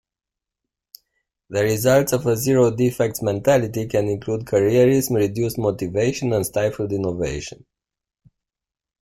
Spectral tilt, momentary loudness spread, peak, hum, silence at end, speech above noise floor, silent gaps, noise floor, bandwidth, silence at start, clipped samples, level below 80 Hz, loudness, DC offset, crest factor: -6 dB/octave; 8 LU; -4 dBFS; none; 1.45 s; 68 dB; none; -88 dBFS; 16.5 kHz; 1.5 s; under 0.1%; -48 dBFS; -20 LUFS; under 0.1%; 16 dB